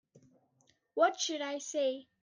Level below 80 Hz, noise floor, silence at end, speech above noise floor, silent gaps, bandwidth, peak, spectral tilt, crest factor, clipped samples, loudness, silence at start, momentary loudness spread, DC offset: under -90 dBFS; -73 dBFS; 0.2 s; 40 dB; none; 10 kHz; -14 dBFS; -1 dB/octave; 20 dB; under 0.1%; -33 LUFS; 0.15 s; 8 LU; under 0.1%